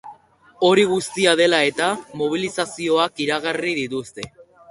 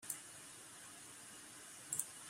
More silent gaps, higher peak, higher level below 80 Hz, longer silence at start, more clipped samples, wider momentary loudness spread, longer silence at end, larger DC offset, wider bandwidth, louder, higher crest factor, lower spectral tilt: neither; first, -2 dBFS vs -20 dBFS; first, -60 dBFS vs -86 dBFS; about the same, 0.05 s vs 0 s; neither; about the same, 12 LU vs 11 LU; first, 0.3 s vs 0 s; neither; second, 11.5 kHz vs 16 kHz; first, -20 LUFS vs -48 LUFS; second, 18 dB vs 32 dB; first, -3.5 dB/octave vs -0.5 dB/octave